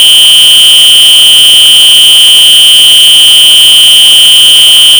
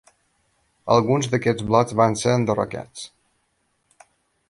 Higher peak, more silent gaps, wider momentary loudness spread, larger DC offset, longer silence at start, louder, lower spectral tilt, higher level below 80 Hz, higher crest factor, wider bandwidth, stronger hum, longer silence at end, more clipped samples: about the same, 0 dBFS vs -2 dBFS; neither; second, 0 LU vs 18 LU; neither; second, 0 s vs 0.85 s; first, 2 LUFS vs -20 LUFS; second, 3 dB/octave vs -5.5 dB/octave; first, -42 dBFS vs -54 dBFS; second, 0 dB vs 20 dB; first, over 20 kHz vs 11.5 kHz; neither; second, 0 s vs 1.45 s; first, 70% vs under 0.1%